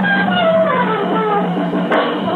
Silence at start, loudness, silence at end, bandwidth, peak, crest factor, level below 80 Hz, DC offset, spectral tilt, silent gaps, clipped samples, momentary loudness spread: 0 s; -15 LUFS; 0 s; 4.5 kHz; -4 dBFS; 12 dB; -60 dBFS; under 0.1%; -8 dB/octave; none; under 0.1%; 4 LU